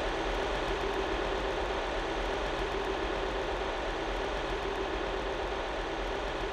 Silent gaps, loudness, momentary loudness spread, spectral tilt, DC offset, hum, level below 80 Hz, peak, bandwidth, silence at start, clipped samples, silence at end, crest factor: none; -33 LUFS; 2 LU; -4.5 dB/octave; under 0.1%; none; -40 dBFS; -20 dBFS; 13 kHz; 0 s; under 0.1%; 0 s; 12 dB